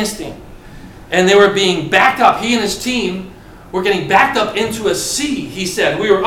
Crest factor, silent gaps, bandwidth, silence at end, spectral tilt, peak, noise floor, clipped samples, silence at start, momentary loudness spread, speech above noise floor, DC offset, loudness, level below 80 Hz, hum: 14 dB; none; 17 kHz; 0 s; -3.5 dB/octave; 0 dBFS; -35 dBFS; under 0.1%; 0 s; 12 LU; 21 dB; under 0.1%; -14 LUFS; -42 dBFS; none